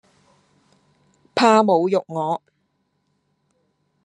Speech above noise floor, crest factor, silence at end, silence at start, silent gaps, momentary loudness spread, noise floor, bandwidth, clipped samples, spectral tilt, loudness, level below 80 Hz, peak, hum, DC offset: 52 dB; 22 dB; 1.65 s; 1.35 s; none; 12 LU; -70 dBFS; 11 kHz; under 0.1%; -5.5 dB/octave; -19 LUFS; -72 dBFS; -2 dBFS; none; under 0.1%